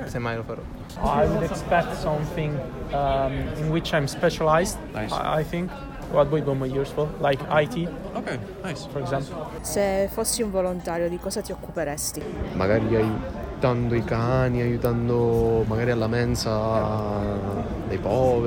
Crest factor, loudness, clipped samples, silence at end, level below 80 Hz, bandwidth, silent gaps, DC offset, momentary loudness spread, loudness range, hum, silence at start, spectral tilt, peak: 18 dB; -25 LUFS; under 0.1%; 0 s; -38 dBFS; 19.5 kHz; none; under 0.1%; 9 LU; 3 LU; none; 0 s; -5.5 dB/octave; -6 dBFS